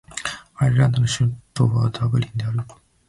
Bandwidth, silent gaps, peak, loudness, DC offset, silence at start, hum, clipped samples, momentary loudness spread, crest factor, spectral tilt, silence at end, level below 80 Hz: 11.5 kHz; none; -6 dBFS; -21 LUFS; under 0.1%; 0.1 s; none; under 0.1%; 11 LU; 16 dB; -5.5 dB/octave; 0.4 s; -46 dBFS